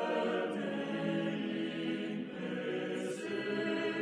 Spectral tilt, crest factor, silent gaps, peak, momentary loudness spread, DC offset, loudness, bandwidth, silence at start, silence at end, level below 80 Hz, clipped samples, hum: -6 dB/octave; 12 dB; none; -22 dBFS; 4 LU; under 0.1%; -36 LUFS; 12 kHz; 0 s; 0 s; -84 dBFS; under 0.1%; none